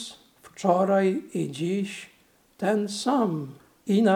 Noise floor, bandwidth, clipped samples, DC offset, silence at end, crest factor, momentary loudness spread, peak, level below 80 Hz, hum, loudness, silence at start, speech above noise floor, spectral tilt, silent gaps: -50 dBFS; 15.5 kHz; under 0.1%; under 0.1%; 0 s; 20 dB; 17 LU; -6 dBFS; -74 dBFS; none; -26 LUFS; 0 s; 26 dB; -6 dB/octave; none